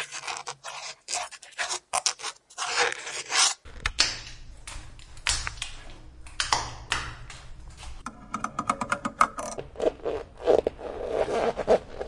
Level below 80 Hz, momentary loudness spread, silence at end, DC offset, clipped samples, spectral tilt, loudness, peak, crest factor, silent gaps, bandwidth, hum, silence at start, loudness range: -46 dBFS; 20 LU; 0 s; under 0.1%; under 0.1%; -1.5 dB/octave; -28 LUFS; -2 dBFS; 28 dB; none; 11.5 kHz; none; 0 s; 5 LU